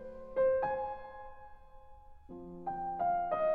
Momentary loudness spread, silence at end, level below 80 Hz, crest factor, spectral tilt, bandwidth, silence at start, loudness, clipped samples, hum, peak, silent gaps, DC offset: 21 LU; 0 s; -58 dBFS; 14 dB; -8.5 dB/octave; 4.5 kHz; 0 s; -35 LUFS; under 0.1%; none; -22 dBFS; none; under 0.1%